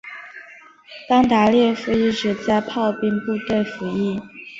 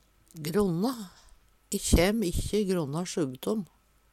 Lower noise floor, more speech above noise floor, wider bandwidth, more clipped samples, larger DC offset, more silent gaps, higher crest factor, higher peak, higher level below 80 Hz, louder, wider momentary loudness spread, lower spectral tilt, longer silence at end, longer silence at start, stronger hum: second, -45 dBFS vs -54 dBFS; about the same, 26 dB vs 26 dB; second, 7.8 kHz vs 17 kHz; neither; neither; neither; second, 16 dB vs 22 dB; first, -4 dBFS vs -8 dBFS; second, -52 dBFS vs -38 dBFS; first, -20 LUFS vs -29 LUFS; first, 21 LU vs 14 LU; about the same, -6 dB/octave vs -5 dB/octave; second, 0 s vs 0.5 s; second, 0.05 s vs 0.35 s; neither